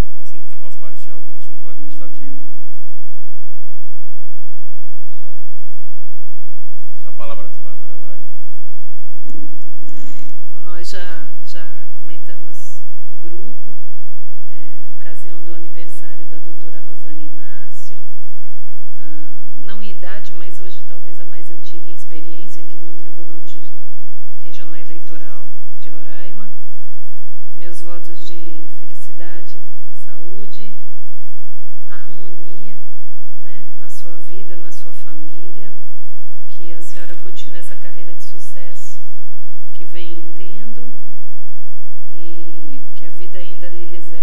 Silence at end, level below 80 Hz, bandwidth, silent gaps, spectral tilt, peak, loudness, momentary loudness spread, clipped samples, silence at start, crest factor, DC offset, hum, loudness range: 0 s; -58 dBFS; 17.5 kHz; none; -6.5 dB/octave; 0 dBFS; -43 LUFS; 13 LU; under 0.1%; 0 s; 24 dB; 90%; none; 6 LU